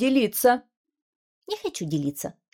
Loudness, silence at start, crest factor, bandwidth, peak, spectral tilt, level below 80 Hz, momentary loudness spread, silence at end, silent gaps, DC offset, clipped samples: -25 LUFS; 0 s; 18 dB; 18 kHz; -8 dBFS; -4.5 dB/octave; -66 dBFS; 13 LU; 0.25 s; 0.77-0.85 s, 1.02-1.42 s; under 0.1%; under 0.1%